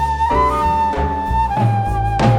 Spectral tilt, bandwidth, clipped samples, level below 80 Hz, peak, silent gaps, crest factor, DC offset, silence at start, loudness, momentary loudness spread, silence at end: -7.5 dB/octave; 14.5 kHz; under 0.1%; -26 dBFS; -2 dBFS; none; 14 dB; under 0.1%; 0 s; -17 LUFS; 3 LU; 0 s